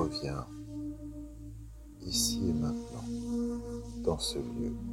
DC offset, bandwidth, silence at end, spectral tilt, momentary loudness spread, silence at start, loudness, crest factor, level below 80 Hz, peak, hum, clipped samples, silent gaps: under 0.1%; 16.5 kHz; 0 s; -4.5 dB/octave; 17 LU; 0 s; -35 LUFS; 20 dB; -48 dBFS; -16 dBFS; none; under 0.1%; none